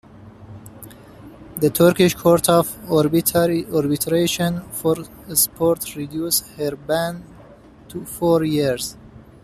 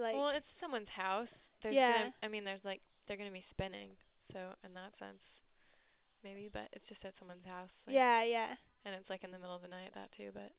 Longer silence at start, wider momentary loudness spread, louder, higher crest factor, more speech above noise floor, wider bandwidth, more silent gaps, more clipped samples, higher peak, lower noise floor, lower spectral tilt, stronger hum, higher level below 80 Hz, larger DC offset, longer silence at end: first, 0.2 s vs 0 s; second, 17 LU vs 21 LU; first, -19 LUFS vs -39 LUFS; about the same, 18 dB vs 22 dB; second, 26 dB vs 34 dB; first, 15 kHz vs 4 kHz; neither; neither; first, -2 dBFS vs -18 dBFS; second, -45 dBFS vs -74 dBFS; first, -4.5 dB/octave vs -1.5 dB/octave; neither; first, -50 dBFS vs -70 dBFS; neither; about the same, 0.2 s vs 0.1 s